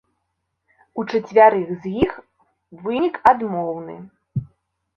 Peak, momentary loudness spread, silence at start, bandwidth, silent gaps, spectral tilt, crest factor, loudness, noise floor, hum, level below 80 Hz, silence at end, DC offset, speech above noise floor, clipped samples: -2 dBFS; 19 LU; 0.95 s; 6.8 kHz; none; -8 dB/octave; 20 dB; -19 LUFS; -75 dBFS; none; -54 dBFS; 0.5 s; under 0.1%; 56 dB; under 0.1%